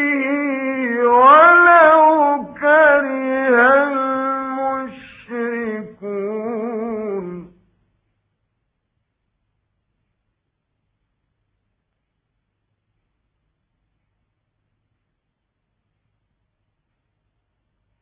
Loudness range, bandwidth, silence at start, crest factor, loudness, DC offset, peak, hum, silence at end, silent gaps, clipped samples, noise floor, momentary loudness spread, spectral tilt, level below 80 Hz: 18 LU; 4 kHz; 0 s; 18 dB; -14 LUFS; under 0.1%; 0 dBFS; none; 10.55 s; none; under 0.1%; -75 dBFS; 18 LU; -8 dB/octave; -64 dBFS